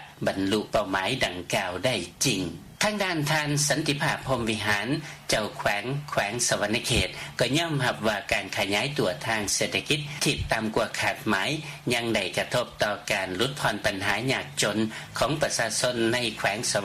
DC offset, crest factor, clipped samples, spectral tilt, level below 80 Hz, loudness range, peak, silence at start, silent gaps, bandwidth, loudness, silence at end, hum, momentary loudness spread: under 0.1%; 18 dB; under 0.1%; -3.5 dB/octave; -50 dBFS; 1 LU; -8 dBFS; 0 s; none; 15.5 kHz; -26 LUFS; 0 s; none; 4 LU